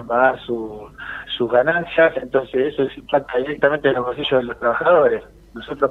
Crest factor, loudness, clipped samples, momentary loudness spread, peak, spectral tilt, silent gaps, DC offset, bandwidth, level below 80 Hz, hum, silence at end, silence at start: 16 dB; -19 LUFS; under 0.1%; 16 LU; -2 dBFS; -7 dB/octave; none; under 0.1%; 4.5 kHz; -50 dBFS; none; 0 s; 0 s